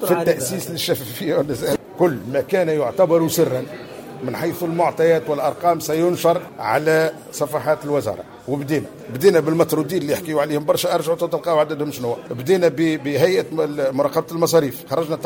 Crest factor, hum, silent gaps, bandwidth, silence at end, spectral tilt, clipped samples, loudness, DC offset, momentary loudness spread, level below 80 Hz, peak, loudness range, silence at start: 16 dB; none; none; 17 kHz; 0 s; -5 dB/octave; under 0.1%; -20 LUFS; under 0.1%; 8 LU; -58 dBFS; -4 dBFS; 1 LU; 0 s